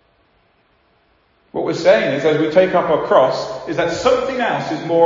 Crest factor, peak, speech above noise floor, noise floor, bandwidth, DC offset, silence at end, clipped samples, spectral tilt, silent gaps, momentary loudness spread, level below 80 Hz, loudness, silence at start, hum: 16 dB; 0 dBFS; 43 dB; -58 dBFS; 7.6 kHz; under 0.1%; 0 s; under 0.1%; -5.5 dB/octave; none; 9 LU; -52 dBFS; -16 LUFS; 1.55 s; none